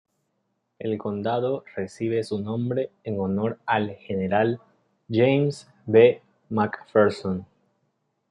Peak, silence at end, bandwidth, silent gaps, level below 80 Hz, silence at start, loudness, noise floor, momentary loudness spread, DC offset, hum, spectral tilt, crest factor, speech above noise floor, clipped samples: -4 dBFS; 0.85 s; 10.5 kHz; none; -68 dBFS; 0.8 s; -24 LUFS; -75 dBFS; 11 LU; under 0.1%; none; -7.5 dB/octave; 20 dB; 52 dB; under 0.1%